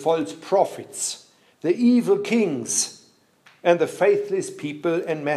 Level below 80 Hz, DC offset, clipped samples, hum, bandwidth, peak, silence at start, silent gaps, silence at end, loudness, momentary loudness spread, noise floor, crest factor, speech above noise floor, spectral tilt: -76 dBFS; under 0.1%; under 0.1%; none; 14 kHz; -4 dBFS; 0 s; none; 0 s; -22 LUFS; 9 LU; -56 dBFS; 18 dB; 35 dB; -4 dB/octave